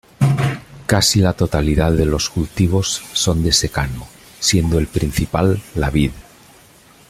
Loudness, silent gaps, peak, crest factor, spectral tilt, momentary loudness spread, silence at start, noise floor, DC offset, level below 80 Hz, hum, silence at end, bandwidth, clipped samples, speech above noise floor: -17 LUFS; none; -2 dBFS; 16 dB; -4.5 dB/octave; 7 LU; 0.2 s; -47 dBFS; under 0.1%; -30 dBFS; none; 0.9 s; 16 kHz; under 0.1%; 30 dB